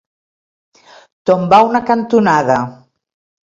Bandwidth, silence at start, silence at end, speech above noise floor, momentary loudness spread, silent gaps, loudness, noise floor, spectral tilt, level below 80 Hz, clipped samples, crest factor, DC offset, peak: 7.8 kHz; 1.25 s; 0.7 s; over 78 dB; 9 LU; none; -13 LUFS; under -90 dBFS; -6.5 dB/octave; -54 dBFS; under 0.1%; 16 dB; under 0.1%; 0 dBFS